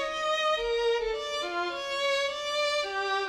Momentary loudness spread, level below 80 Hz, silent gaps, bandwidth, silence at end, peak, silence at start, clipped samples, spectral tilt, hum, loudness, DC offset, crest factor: 4 LU; -56 dBFS; none; 13.5 kHz; 0 s; -18 dBFS; 0 s; under 0.1%; -1 dB/octave; none; -28 LUFS; under 0.1%; 12 dB